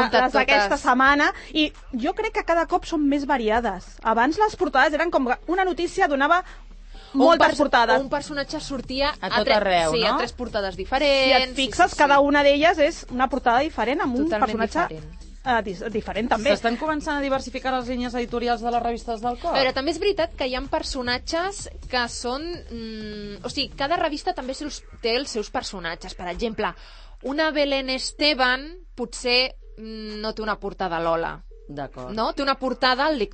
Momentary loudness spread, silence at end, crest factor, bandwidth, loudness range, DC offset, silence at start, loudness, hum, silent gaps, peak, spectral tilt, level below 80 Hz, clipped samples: 14 LU; 0 s; 18 dB; 8.8 kHz; 8 LU; under 0.1%; 0 s; -22 LUFS; none; none; -4 dBFS; -3.5 dB/octave; -42 dBFS; under 0.1%